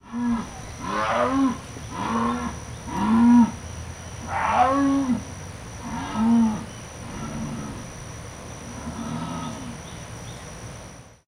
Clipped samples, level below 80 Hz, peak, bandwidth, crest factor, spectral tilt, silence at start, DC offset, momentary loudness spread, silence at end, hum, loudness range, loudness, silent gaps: under 0.1%; -44 dBFS; -6 dBFS; 12.5 kHz; 18 dB; -5.5 dB/octave; 0.05 s; under 0.1%; 18 LU; 0.25 s; none; 12 LU; -24 LUFS; none